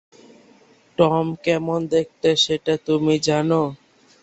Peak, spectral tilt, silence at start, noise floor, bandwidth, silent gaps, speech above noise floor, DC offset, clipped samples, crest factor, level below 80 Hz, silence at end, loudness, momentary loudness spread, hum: -2 dBFS; -5 dB/octave; 1 s; -53 dBFS; 8.2 kHz; none; 34 dB; under 0.1%; under 0.1%; 20 dB; -58 dBFS; 0.45 s; -20 LUFS; 4 LU; none